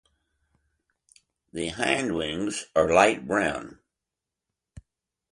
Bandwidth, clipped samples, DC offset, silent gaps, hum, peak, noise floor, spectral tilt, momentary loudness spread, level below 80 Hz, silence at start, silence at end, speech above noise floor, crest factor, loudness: 11.5 kHz; under 0.1%; under 0.1%; none; none; -6 dBFS; -87 dBFS; -4 dB/octave; 16 LU; -54 dBFS; 1.55 s; 0.5 s; 62 dB; 24 dB; -25 LUFS